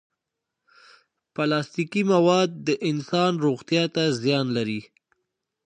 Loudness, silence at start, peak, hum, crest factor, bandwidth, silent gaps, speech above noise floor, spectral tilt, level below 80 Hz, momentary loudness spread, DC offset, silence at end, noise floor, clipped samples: -23 LUFS; 1.4 s; -6 dBFS; none; 18 dB; 9.6 kHz; none; 61 dB; -5.5 dB/octave; -70 dBFS; 8 LU; under 0.1%; 0.85 s; -84 dBFS; under 0.1%